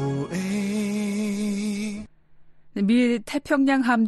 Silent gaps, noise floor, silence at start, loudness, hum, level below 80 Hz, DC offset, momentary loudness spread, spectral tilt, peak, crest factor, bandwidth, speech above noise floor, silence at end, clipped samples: none; -49 dBFS; 0 s; -24 LUFS; none; -58 dBFS; under 0.1%; 10 LU; -6 dB/octave; -10 dBFS; 14 dB; 12.5 kHz; 28 dB; 0 s; under 0.1%